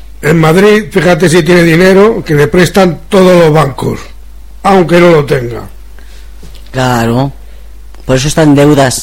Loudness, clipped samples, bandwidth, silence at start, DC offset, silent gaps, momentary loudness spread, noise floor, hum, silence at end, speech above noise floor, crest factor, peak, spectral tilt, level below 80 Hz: -7 LUFS; 2%; 16.5 kHz; 0.05 s; 4%; none; 12 LU; -30 dBFS; none; 0 s; 24 dB; 8 dB; 0 dBFS; -6 dB/octave; -30 dBFS